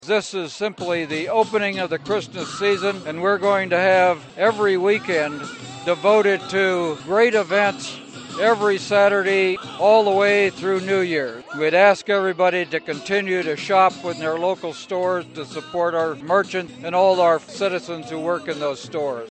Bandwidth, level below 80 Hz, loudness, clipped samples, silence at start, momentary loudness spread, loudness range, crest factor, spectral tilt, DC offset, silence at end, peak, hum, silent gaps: 8.8 kHz; -66 dBFS; -20 LUFS; under 0.1%; 0.05 s; 11 LU; 4 LU; 18 dB; -4.5 dB/octave; under 0.1%; 0 s; -2 dBFS; none; none